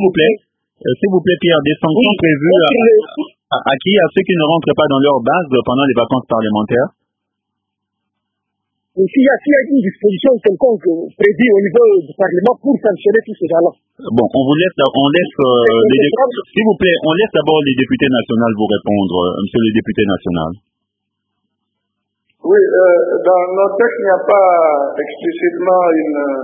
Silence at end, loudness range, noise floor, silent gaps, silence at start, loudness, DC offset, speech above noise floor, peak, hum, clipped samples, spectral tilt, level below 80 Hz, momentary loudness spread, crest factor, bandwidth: 0 s; 5 LU; -76 dBFS; none; 0 s; -13 LUFS; under 0.1%; 64 dB; 0 dBFS; none; under 0.1%; -9 dB/octave; -48 dBFS; 7 LU; 12 dB; 3.8 kHz